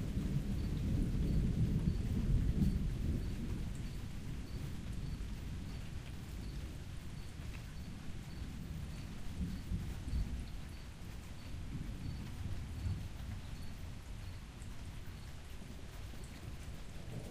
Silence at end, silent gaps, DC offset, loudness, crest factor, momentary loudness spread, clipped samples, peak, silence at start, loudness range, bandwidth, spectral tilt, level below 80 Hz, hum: 0 s; none; under 0.1%; -43 LUFS; 20 dB; 14 LU; under 0.1%; -20 dBFS; 0 s; 11 LU; 15.5 kHz; -7 dB/octave; -44 dBFS; none